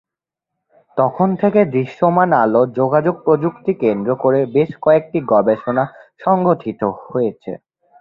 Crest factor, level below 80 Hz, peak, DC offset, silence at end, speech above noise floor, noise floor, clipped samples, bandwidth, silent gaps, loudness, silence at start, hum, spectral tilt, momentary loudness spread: 16 dB; -58 dBFS; -2 dBFS; under 0.1%; 0.45 s; 68 dB; -84 dBFS; under 0.1%; 5.2 kHz; none; -16 LUFS; 0.95 s; none; -10.5 dB/octave; 8 LU